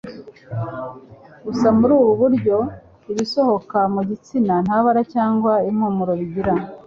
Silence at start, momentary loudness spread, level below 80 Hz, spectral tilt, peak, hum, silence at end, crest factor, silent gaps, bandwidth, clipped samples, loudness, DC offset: 0.05 s; 14 LU; -50 dBFS; -7.5 dB/octave; -4 dBFS; none; 0.05 s; 14 dB; none; 7.6 kHz; under 0.1%; -19 LUFS; under 0.1%